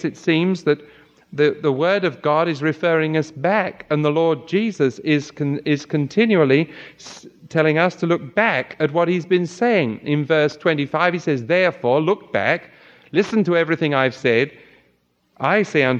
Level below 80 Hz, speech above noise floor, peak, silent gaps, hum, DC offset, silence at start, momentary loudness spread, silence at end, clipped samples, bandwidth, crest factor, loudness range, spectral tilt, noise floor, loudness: -66 dBFS; 44 dB; -2 dBFS; none; none; under 0.1%; 0 s; 6 LU; 0 s; under 0.1%; 8.2 kHz; 18 dB; 1 LU; -6.5 dB/octave; -63 dBFS; -19 LUFS